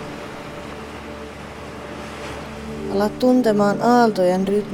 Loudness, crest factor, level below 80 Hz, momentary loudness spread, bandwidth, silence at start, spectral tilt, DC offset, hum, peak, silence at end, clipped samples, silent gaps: -18 LUFS; 18 dB; -46 dBFS; 18 LU; 17.5 kHz; 0 s; -6.5 dB/octave; under 0.1%; none; -4 dBFS; 0 s; under 0.1%; none